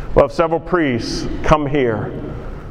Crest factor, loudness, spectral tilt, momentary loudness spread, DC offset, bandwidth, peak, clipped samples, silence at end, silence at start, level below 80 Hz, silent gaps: 18 dB; -18 LUFS; -6.5 dB/octave; 13 LU; under 0.1%; 11.5 kHz; 0 dBFS; under 0.1%; 0 s; 0 s; -28 dBFS; none